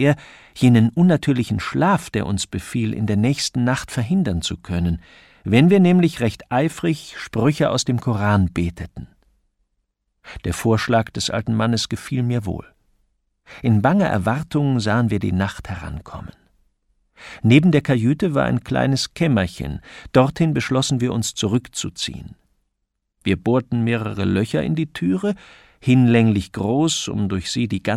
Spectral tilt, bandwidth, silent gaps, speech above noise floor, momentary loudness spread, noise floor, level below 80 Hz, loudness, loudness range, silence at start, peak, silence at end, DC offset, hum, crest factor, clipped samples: -6 dB/octave; 14 kHz; none; 56 dB; 13 LU; -75 dBFS; -44 dBFS; -20 LUFS; 5 LU; 0 s; -2 dBFS; 0 s; under 0.1%; none; 18 dB; under 0.1%